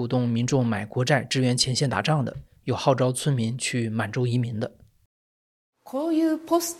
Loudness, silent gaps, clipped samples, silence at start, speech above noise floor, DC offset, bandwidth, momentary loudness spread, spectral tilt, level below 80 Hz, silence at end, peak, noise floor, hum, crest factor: -25 LUFS; 5.06-5.73 s; under 0.1%; 0 s; over 66 dB; under 0.1%; 15 kHz; 8 LU; -5 dB/octave; -58 dBFS; 0 s; -6 dBFS; under -90 dBFS; none; 20 dB